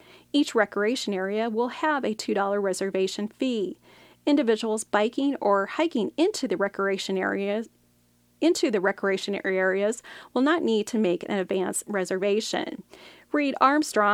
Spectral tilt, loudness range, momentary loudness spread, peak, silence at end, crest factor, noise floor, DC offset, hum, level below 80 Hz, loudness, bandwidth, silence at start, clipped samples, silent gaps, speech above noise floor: -4 dB/octave; 2 LU; 6 LU; -6 dBFS; 0 s; 20 dB; -63 dBFS; under 0.1%; none; -72 dBFS; -26 LUFS; 15.5 kHz; 0.35 s; under 0.1%; none; 38 dB